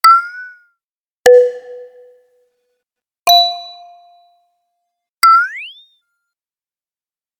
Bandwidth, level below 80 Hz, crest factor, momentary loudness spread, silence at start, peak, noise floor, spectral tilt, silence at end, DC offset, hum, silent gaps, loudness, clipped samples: 19 kHz; -62 dBFS; 16 dB; 23 LU; 0.05 s; 0 dBFS; under -90 dBFS; 1 dB/octave; 1.7 s; under 0.1%; none; 0.84-1.23 s, 3.19-3.26 s, 5.09-5.17 s; -11 LUFS; under 0.1%